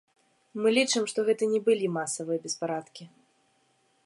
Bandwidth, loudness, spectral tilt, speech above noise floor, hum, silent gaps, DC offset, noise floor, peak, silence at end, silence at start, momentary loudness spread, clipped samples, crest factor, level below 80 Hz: 11.5 kHz; -27 LUFS; -3.5 dB/octave; 41 dB; none; none; under 0.1%; -69 dBFS; -10 dBFS; 1 s; 0.55 s; 14 LU; under 0.1%; 18 dB; -84 dBFS